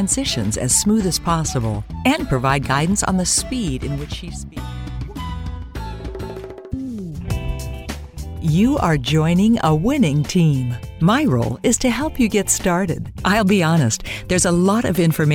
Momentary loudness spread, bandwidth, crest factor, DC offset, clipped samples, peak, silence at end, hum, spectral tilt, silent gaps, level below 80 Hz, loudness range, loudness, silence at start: 15 LU; 17 kHz; 16 dB; under 0.1%; under 0.1%; -4 dBFS; 0 s; none; -5 dB/octave; none; -34 dBFS; 12 LU; -18 LUFS; 0 s